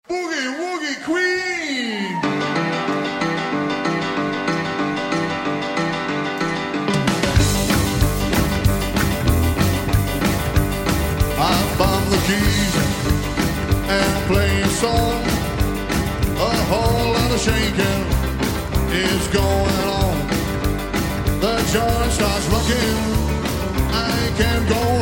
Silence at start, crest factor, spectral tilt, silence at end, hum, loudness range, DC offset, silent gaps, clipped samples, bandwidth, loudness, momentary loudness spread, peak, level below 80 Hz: 0.1 s; 16 dB; -5 dB/octave; 0 s; none; 3 LU; under 0.1%; none; under 0.1%; 17 kHz; -19 LUFS; 5 LU; -4 dBFS; -28 dBFS